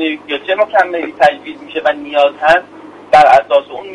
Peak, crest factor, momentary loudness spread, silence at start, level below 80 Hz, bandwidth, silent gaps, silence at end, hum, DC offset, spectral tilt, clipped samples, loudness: 0 dBFS; 12 dB; 10 LU; 0 s; -50 dBFS; 11 kHz; none; 0 s; 50 Hz at -50 dBFS; under 0.1%; -4 dB/octave; 0.2%; -12 LUFS